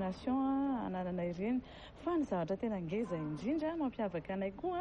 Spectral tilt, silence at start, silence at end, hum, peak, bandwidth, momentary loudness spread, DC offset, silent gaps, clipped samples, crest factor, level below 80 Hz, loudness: -8 dB/octave; 0 s; 0 s; none; -26 dBFS; 8.6 kHz; 5 LU; under 0.1%; none; under 0.1%; 12 dB; -60 dBFS; -37 LUFS